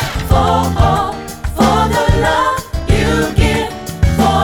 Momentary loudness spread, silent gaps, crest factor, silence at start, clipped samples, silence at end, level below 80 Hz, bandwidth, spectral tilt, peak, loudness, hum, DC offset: 8 LU; none; 12 dB; 0 s; under 0.1%; 0 s; -20 dBFS; 19.5 kHz; -5.5 dB/octave; 0 dBFS; -14 LUFS; none; under 0.1%